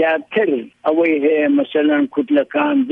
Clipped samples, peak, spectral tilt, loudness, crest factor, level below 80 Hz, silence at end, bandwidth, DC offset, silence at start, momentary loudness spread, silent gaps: under 0.1%; -4 dBFS; -7.5 dB/octave; -17 LUFS; 12 dB; -70 dBFS; 0 s; 3.8 kHz; under 0.1%; 0 s; 4 LU; none